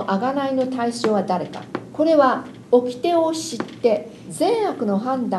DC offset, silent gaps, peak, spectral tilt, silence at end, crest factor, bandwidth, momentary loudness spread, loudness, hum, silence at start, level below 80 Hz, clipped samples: under 0.1%; none; -4 dBFS; -5.5 dB/octave; 0 s; 18 dB; 12.5 kHz; 10 LU; -21 LUFS; none; 0 s; -64 dBFS; under 0.1%